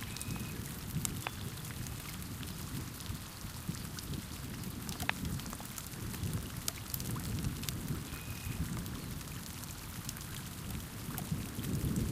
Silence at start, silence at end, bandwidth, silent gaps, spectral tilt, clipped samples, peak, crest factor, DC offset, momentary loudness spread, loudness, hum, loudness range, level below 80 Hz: 0 s; 0 s; 16 kHz; none; -4 dB/octave; under 0.1%; -10 dBFS; 32 dB; under 0.1%; 6 LU; -40 LUFS; none; 3 LU; -50 dBFS